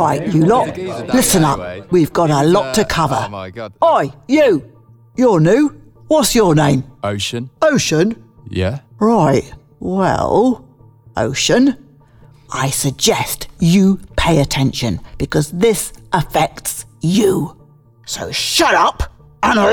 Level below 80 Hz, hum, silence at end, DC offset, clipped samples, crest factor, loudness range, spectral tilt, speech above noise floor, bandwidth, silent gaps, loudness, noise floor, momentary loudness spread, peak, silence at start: -38 dBFS; none; 0 s; under 0.1%; under 0.1%; 12 dB; 3 LU; -5 dB/octave; 32 dB; over 20 kHz; none; -15 LUFS; -46 dBFS; 11 LU; -2 dBFS; 0 s